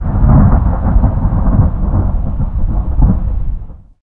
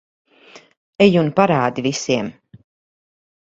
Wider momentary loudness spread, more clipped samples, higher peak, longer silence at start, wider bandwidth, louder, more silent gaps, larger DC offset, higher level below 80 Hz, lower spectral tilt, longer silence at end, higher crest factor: about the same, 10 LU vs 8 LU; neither; about the same, 0 dBFS vs 0 dBFS; second, 0 s vs 0.55 s; second, 2.3 kHz vs 8 kHz; first, -14 LUFS vs -17 LUFS; second, none vs 0.77-0.93 s; neither; first, -14 dBFS vs -56 dBFS; first, -13.5 dB/octave vs -5.5 dB/octave; second, 0.25 s vs 1.1 s; second, 10 dB vs 20 dB